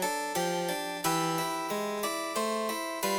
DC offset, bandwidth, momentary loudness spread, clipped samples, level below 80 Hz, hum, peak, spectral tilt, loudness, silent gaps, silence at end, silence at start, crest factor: under 0.1%; over 20 kHz; 3 LU; under 0.1%; -72 dBFS; none; -14 dBFS; -3 dB/octave; -31 LUFS; none; 0 s; 0 s; 18 dB